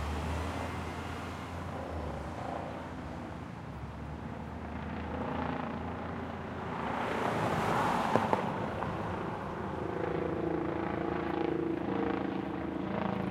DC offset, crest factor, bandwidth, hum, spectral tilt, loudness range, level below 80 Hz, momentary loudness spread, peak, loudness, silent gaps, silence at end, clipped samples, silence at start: under 0.1%; 26 dB; 16 kHz; none; -7 dB/octave; 8 LU; -52 dBFS; 11 LU; -8 dBFS; -36 LUFS; none; 0 s; under 0.1%; 0 s